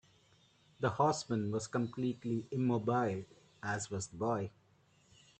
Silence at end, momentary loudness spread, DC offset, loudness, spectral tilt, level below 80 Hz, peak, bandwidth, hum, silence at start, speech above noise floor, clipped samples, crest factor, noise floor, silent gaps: 0.9 s; 9 LU; under 0.1%; -36 LUFS; -6 dB/octave; -72 dBFS; -16 dBFS; 9 kHz; none; 0.8 s; 34 dB; under 0.1%; 20 dB; -69 dBFS; none